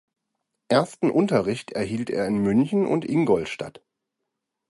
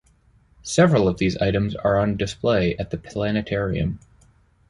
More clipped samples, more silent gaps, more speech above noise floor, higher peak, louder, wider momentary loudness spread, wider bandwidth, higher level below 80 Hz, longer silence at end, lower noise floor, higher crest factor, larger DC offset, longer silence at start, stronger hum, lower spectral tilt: neither; neither; first, 59 dB vs 37 dB; about the same, -6 dBFS vs -4 dBFS; about the same, -23 LUFS vs -22 LUFS; second, 7 LU vs 11 LU; about the same, 11.5 kHz vs 11.5 kHz; second, -58 dBFS vs -42 dBFS; first, 1 s vs 0.75 s; first, -82 dBFS vs -58 dBFS; about the same, 18 dB vs 18 dB; neither; about the same, 0.7 s vs 0.65 s; neither; about the same, -7 dB/octave vs -6 dB/octave